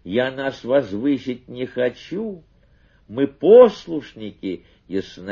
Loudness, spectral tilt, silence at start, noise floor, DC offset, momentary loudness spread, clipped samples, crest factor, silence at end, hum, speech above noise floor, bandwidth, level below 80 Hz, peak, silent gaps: -19 LUFS; -7 dB/octave; 0.05 s; -55 dBFS; under 0.1%; 20 LU; under 0.1%; 20 dB; 0 s; none; 36 dB; 6.8 kHz; -56 dBFS; 0 dBFS; none